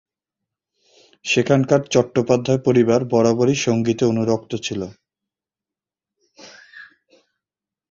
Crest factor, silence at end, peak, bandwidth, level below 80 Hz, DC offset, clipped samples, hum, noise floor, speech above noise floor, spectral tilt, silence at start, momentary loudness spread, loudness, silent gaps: 18 dB; 1.05 s; -2 dBFS; 7.8 kHz; -56 dBFS; under 0.1%; under 0.1%; none; -89 dBFS; 71 dB; -5.5 dB/octave; 1.25 s; 10 LU; -18 LUFS; none